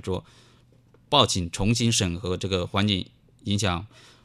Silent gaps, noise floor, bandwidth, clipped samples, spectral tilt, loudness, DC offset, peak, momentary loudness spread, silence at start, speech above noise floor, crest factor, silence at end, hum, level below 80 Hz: none; -57 dBFS; 14 kHz; under 0.1%; -4 dB/octave; -24 LUFS; under 0.1%; -2 dBFS; 13 LU; 0.05 s; 32 dB; 24 dB; 0.4 s; none; -46 dBFS